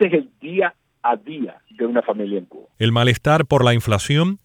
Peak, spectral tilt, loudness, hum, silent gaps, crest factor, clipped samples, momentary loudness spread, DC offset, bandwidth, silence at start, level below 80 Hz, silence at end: -2 dBFS; -6 dB/octave; -19 LUFS; none; none; 18 dB; under 0.1%; 11 LU; under 0.1%; 16 kHz; 0 s; -48 dBFS; 0.1 s